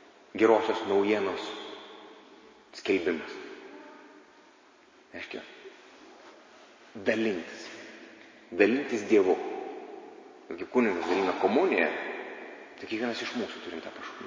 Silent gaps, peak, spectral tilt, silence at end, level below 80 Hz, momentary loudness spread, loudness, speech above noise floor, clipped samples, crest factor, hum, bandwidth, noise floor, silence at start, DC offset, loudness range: none; -8 dBFS; -5 dB/octave; 0 s; -72 dBFS; 23 LU; -29 LUFS; 30 dB; under 0.1%; 22 dB; none; 7.6 kHz; -58 dBFS; 0.35 s; under 0.1%; 11 LU